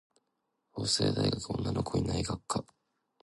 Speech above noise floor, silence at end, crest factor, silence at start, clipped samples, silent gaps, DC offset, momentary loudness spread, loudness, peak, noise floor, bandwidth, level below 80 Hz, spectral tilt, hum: 50 dB; 0.6 s; 20 dB; 0.75 s; under 0.1%; none; under 0.1%; 8 LU; -32 LUFS; -14 dBFS; -81 dBFS; 11.5 kHz; -50 dBFS; -5 dB/octave; none